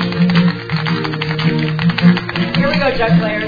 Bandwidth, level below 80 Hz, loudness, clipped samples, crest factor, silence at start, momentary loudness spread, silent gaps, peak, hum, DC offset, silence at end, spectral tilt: 5 kHz; -38 dBFS; -15 LUFS; under 0.1%; 14 dB; 0 s; 5 LU; none; 0 dBFS; none; under 0.1%; 0 s; -8 dB/octave